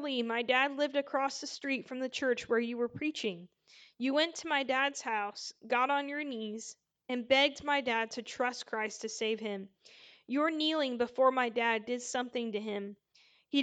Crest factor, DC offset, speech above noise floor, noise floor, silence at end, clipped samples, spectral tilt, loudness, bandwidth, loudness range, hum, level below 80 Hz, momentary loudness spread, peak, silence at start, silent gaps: 20 dB; under 0.1%; 33 dB; -66 dBFS; 0 s; under 0.1%; -2.5 dB/octave; -33 LUFS; 9.2 kHz; 2 LU; none; -78 dBFS; 11 LU; -14 dBFS; 0 s; none